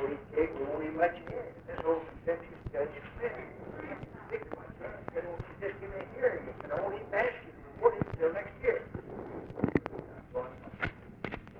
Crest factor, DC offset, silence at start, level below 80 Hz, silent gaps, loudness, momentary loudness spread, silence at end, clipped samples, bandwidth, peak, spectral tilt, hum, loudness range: 24 dB; under 0.1%; 0 s; -56 dBFS; none; -36 LUFS; 12 LU; 0 s; under 0.1%; 5.4 kHz; -12 dBFS; -8.5 dB/octave; none; 7 LU